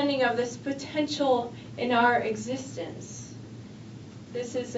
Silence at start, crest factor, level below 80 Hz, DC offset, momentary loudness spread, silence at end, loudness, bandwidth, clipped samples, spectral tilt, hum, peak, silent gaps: 0 s; 18 dB; -64 dBFS; under 0.1%; 21 LU; 0 s; -28 LUFS; 8 kHz; under 0.1%; -4.5 dB/octave; none; -10 dBFS; none